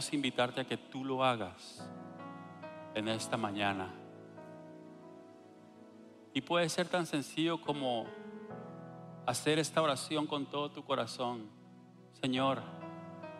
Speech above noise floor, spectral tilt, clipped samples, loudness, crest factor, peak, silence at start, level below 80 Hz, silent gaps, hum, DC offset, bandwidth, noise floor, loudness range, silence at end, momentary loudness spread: 22 dB; -4.5 dB/octave; under 0.1%; -35 LUFS; 22 dB; -16 dBFS; 0 s; -78 dBFS; none; none; under 0.1%; 15 kHz; -57 dBFS; 5 LU; 0 s; 21 LU